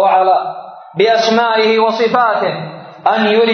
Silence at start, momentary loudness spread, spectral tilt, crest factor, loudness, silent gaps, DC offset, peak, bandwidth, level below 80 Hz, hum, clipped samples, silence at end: 0 s; 14 LU; -4.5 dB/octave; 12 dB; -13 LUFS; none; under 0.1%; 0 dBFS; 6.6 kHz; -72 dBFS; none; under 0.1%; 0 s